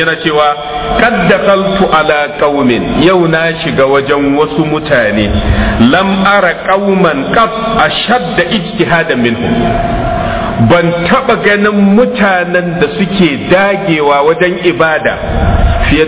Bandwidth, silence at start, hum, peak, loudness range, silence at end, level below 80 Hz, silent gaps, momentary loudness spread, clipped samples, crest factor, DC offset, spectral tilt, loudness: 4 kHz; 0 s; none; 0 dBFS; 1 LU; 0 s; -22 dBFS; none; 4 LU; under 0.1%; 10 dB; under 0.1%; -10 dB/octave; -9 LUFS